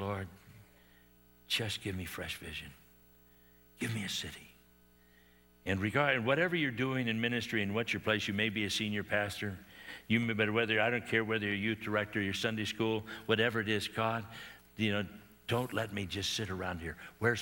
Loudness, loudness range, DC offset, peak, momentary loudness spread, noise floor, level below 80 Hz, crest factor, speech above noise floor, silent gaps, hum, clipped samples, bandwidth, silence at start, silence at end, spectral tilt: -34 LUFS; 9 LU; under 0.1%; -14 dBFS; 14 LU; -64 dBFS; -66 dBFS; 22 dB; 30 dB; none; 60 Hz at -65 dBFS; under 0.1%; 18.5 kHz; 0 s; 0 s; -4.5 dB/octave